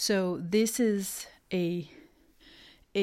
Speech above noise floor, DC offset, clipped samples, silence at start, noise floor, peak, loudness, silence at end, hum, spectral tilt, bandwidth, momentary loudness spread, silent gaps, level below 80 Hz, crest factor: 30 dB; under 0.1%; under 0.1%; 0 s; -59 dBFS; -16 dBFS; -30 LUFS; 0 s; none; -4.5 dB/octave; 16 kHz; 11 LU; none; -66 dBFS; 16 dB